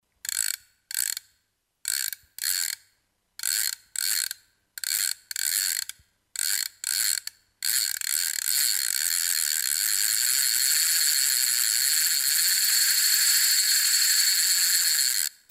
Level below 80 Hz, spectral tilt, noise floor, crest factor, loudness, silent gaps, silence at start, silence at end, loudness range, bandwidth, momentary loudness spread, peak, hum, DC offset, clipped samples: -74 dBFS; 5.5 dB/octave; -74 dBFS; 24 dB; -22 LUFS; none; 0.25 s; 0.2 s; 9 LU; 16.5 kHz; 11 LU; 0 dBFS; none; under 0.1%; under 0.1%